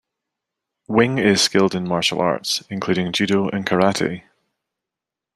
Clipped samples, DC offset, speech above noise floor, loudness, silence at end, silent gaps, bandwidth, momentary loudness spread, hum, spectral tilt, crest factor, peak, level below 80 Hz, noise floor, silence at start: under 0.1%; under 0.1%; 67 dB; -19 LUFS; 1.15 s; none; 13.5 kHz; 7 LU; none; -4 dB/octave; 20 dB; 0 dBFS; -58 dBFS; -86 dBFS; 0.9 s